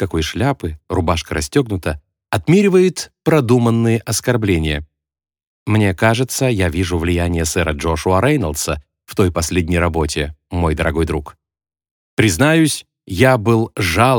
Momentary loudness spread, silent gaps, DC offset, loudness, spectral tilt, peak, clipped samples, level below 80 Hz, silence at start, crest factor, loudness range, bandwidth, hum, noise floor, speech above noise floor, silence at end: 10 LU; 5.47-5.66 s, 11.91-12.17 s; under 0.1%; -17 LUFS; -5.5 dB/octave; 0 dBFS; under 0.1%; -32 dBFS; 0 s; 16 dB; 3 LU; over 20 kHz; none; -87 dBFS; 71 dB; 0 s